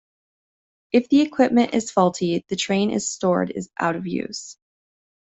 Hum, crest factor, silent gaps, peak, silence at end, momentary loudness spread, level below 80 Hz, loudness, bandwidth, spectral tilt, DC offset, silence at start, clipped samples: none; 18 dB; none; -4 dBFS; 0.7 s; 10 LU; -62 dBFS; -21 LUFS; 8.4 kHz; -5 dB/octave; under 0.1%; 0.95 s; under 0.1%